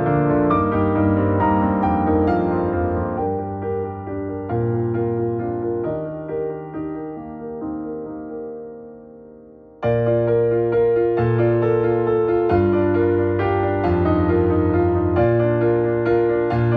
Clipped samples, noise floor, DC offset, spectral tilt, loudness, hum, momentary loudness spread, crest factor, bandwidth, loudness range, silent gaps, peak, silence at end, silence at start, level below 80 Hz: under 0.1%; -44 dBFS; under 0.1%; -11.5 dB/octave; -20 LUFS; none; 12 LU; 14 dB; 4.7 kHz; 10 LU; none; -4 dBFS; 0 s; 0 s; -40 dBFS